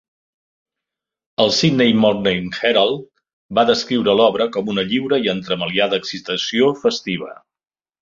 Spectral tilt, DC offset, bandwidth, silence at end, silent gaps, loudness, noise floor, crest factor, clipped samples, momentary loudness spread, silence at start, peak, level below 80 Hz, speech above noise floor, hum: -5 dB/octave; under 0.1%; 7.6 kHz; 0.7 s; 3.33-3.49 s; -17 LUFS; under -90 dBFS; 18 dB; under 0.1%; 9 LU; 1.4 s; -2 dBFS; -56 dBFS; over 73 dB; none